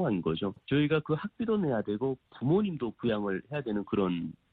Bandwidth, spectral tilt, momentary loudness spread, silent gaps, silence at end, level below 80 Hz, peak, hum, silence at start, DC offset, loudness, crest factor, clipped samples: 4.5 kHz; -10.5 dB/octave; 6 LU; none; 0.2 s; -60 dBFS; -16 dBFS; none; 0 s; under 0.1%; -31 LUFS; 14 dB; under 0.1%